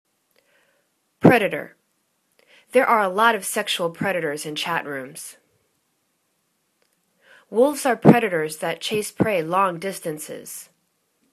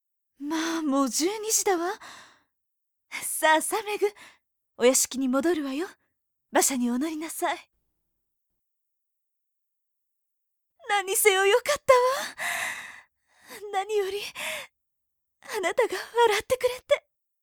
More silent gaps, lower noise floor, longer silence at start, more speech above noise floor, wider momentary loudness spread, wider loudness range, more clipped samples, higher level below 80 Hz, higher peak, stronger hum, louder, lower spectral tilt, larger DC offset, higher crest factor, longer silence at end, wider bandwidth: neither; second, -70 dBFS vs -80 dBFS; first, 1.2 s vs 0.4 s; second, 49 dB vs 55 dB; about the same, 17 LU vs 15 LU; about the same, 8 LU vs 8 LU; neither; about the same, -64 dBFS vs -68 dBFS; first, 0 dBFS vs -4 dBFS; neither; first, -21 LUFS vs -25 LUFS; first, -5 dB/octave vs -1 dB/octave; neither; about the same, 24 dB vs 22 dB; first, 0.7 s vs 0.45 s; second, 14 kHz vs over 20 kHz